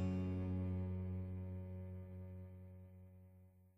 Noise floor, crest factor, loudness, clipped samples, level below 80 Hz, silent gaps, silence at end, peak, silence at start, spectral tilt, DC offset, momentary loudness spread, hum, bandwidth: -65 dBFS; 14 dB; -46 LUFS; under 0.1%; -74 dBFS; none; 0.05 s; -30 dBFS; 0 s; -10 dB/octave; under 0.1%; 20 LU; none; 5 kHz